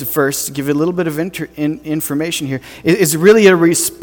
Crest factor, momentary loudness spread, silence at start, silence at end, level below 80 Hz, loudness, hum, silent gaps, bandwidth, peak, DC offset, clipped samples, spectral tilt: 14 dB; 12 LU; 0 s; 0 s; -50 dBFS; -14 LUFS; none; none; 19.5 kHz; 0 dBFS; under 0.1%; under 0.1%; -4.5 dB/octave